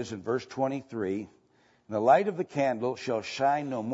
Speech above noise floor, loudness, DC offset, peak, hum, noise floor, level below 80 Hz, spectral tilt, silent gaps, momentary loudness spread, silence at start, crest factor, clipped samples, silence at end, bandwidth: 37 dB; -29 LUFS; under 0.1%; -10 dBFS; none; -65 dBFS; -74 dBFS; -6 dB/octave; none; 10 LU; 0 s; 20 dB; under 0.1%; 0 s; 8 kHz